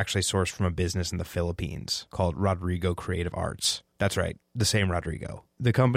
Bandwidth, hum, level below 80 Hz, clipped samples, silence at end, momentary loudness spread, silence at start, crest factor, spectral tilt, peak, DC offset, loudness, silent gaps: 16 kHz; none; -44 dBFS; under 0.1%; 0 s; 6 LU; 0 s; 16 dB; -4.5 dB/octave; -10 dBFS; under 0.1%; -28 LUFS; none